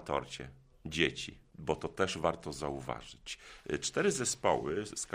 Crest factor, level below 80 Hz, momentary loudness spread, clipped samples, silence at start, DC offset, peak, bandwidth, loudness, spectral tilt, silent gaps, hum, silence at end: 24 dB; -58 dBFS; 14 LU; under 0.1%; 0 s; under 0.1%; -12 dBFS; 15.5 kHz; -35 LUFS; -3.5 dB/octave; none; none; 0 s